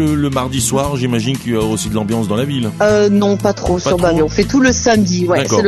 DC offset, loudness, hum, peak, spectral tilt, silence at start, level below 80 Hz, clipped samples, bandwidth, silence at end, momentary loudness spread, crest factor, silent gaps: under 0.1%; -14 LUFS; none; 0 dBFS; -5 dB/octave; 0 s; -34 dBFS; under 0.1%; 12.5 kHz; 0 s; 6 LU; 14 dB; none